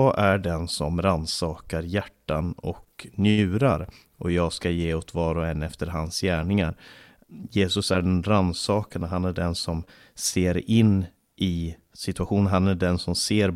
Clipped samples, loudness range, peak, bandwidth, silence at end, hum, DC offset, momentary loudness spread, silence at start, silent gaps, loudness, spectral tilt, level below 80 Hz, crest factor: under 0.1%; 3 LU; -8 dBFS; 15.5 kHz; 0 s; none; under 0.1%; 11 LU; 0 s; none; -25 LUFS; -5.5 dB/octave; -42 dBFS; 16 dB